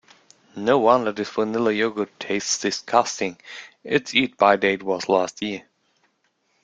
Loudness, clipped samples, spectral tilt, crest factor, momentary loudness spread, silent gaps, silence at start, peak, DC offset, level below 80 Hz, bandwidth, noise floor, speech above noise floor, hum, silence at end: -22 LUFS; under 0.1%; -3.5 dB/octave; 22 dB; 12 LU; none; 0.55 s; -2 dBFS; under 0.1%; -66 dBFS; 9.4 kHz; -69 dBFS; 47 dB; none; 1.05 s